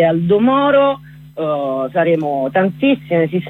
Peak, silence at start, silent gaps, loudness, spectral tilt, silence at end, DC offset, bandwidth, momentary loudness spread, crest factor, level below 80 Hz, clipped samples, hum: -4 dBFS; 0 s; none; -15 LUFS; -9 dB/octave; 0 s; under 0.1%; 4.2 kHz; 9 LU; 12 dB; -54 dBFS; under 0.1%; none